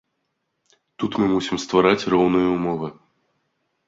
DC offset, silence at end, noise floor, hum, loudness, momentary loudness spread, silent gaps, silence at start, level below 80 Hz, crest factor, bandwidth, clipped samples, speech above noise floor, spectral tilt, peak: under 0.1%; 0.95 s; -75 dBFS; none; -20 LUFS; 11 LU; none; 1 s; -54 dBFS; 20 dB; 7.8 kHz; under 0.1%; 55 dB; -6 dB/octave; -2 dBFS